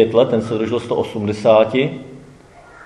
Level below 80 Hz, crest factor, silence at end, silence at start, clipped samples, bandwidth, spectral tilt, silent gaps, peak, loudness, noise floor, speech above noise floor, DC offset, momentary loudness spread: -56 dBFS; 16 dB; 0 s; 0 s; under 0.1%; 10.5 kHz; -7 dB/octave; none; 0 dBFS; -17 LUFS; -43 dBFS; 27 dB; under 0.1%; 9 LU